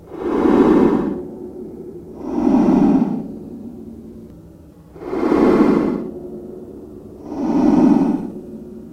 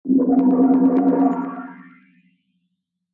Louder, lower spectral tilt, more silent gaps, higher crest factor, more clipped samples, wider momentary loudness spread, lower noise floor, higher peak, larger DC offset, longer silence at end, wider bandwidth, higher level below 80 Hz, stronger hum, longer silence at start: about the same, -16 LUFS vs -17 LUFS; second, -8.5 dB/octave vs -11.5 dB/octave; neither; about the same, 18 dB vs 14 dB; neither; first, 22 LU vs 17 LU; second, -42 dBFS vs -75 dBFS; first, 0 dBFS vs -6 dBFS; neither; second, 0 s vs 1.3 s; first, 8.6 kHz vs 2.6 kHz; first, -44 dBFS vs -64 dBFS; neither; about the same, 0.05 s vs 0.05 s